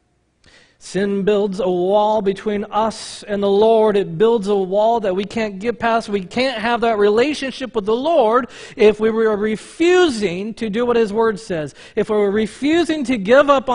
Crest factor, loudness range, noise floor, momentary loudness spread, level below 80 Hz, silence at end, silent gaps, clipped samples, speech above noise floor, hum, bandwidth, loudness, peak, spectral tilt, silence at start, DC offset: 18 dB; 2 LU; -56 dBFS; 9 LU; -50 dBFS; 0 s; none; under 0.1%; 39 dB; none; 10.5 kHz; -17 LUFS; 0 dBFS; -5.5 dB/octave; 0.85 s; under 0.1%